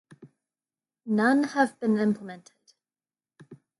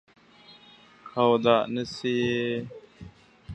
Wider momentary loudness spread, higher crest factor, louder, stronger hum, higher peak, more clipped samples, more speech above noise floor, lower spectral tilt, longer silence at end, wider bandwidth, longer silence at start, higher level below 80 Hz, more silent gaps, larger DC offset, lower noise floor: first, 21 LU vs 15 LU; about the same, 20 dB vs 22 dB; about the same, -25 LUFS vs -25 LUFS; neither; second, -10 dBFS vs -6 dBFS; neither; first, over 65 dB vs 29 dB; about the same, -6.5 dB/octave vs -6 dB/octave; first, 0.25 s vs 0 s; first, 11.5 kHz vs 8.6 kHz; second, 0.25 s vs 0.5 s; second, -78 dBFS vs -60 dBFS; neither; neither; first, under -90 dBFS vs -54 dBFS